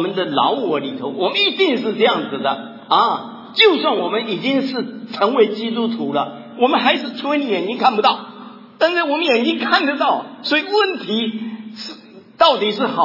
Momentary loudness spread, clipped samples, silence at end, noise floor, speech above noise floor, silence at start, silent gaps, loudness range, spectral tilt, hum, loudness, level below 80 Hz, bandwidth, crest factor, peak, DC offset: 11 LU; under 0.1%; 0 s; -38 dBFS; 21 dB; 0 s; none; 2 LU; -5 dB/octave; none; -17 LUFS; -70 dBFS; 5.8 kHz; 18 dB; 0 dBFS; under 0.1%